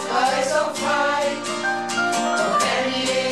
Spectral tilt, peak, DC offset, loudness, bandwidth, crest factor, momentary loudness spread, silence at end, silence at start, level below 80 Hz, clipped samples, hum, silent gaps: -2.5 dB/octave; -8 dBFS; 0.3%; -21 LUFS; 14.5 kHz; 14 dB; 4 LU; 0 s; 0 s; -70 dBFS; under 0.1%; none; none